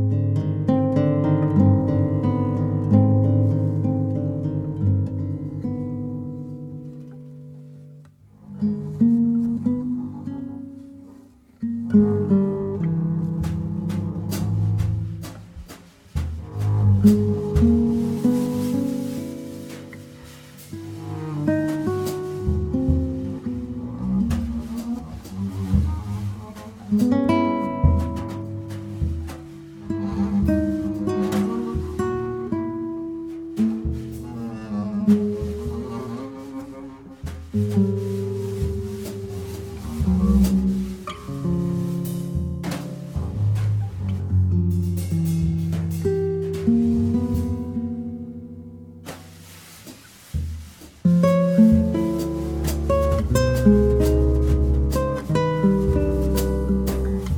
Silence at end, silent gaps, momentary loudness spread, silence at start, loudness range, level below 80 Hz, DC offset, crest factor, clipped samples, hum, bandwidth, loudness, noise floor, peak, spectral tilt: 0 s; none; 19 LU; 0 s; 7 LU; -32 dBFS; under 0.1%; 18 dB; under 0.1%; none; 18.5 kHz; -23 LUFS; -48 dBFS; -4 dBFS; -8.5 dB/octave